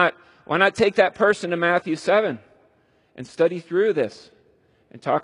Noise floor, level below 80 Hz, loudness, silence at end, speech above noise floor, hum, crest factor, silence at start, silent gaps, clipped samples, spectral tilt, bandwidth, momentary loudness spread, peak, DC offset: -61 dBFS; -64 dBFS; -21 LUFS; 0 s; 40 dB; none; 20 dB; 0 s; none; under 0.1%; -5 dB/octave; 11 kHz; 12 LU; -2 dBFS; under 0.1%